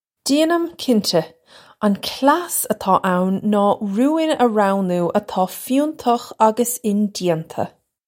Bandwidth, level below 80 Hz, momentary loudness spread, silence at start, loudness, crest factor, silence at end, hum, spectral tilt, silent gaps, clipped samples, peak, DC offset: 16.5 kHz; -62 dBFS; 5 LU; 0.25 s; -19 LUFS; 18 dB; 0.4 s; none; -5 dB/octave; none; under 0.1%; -2 dBFS; under 0.1%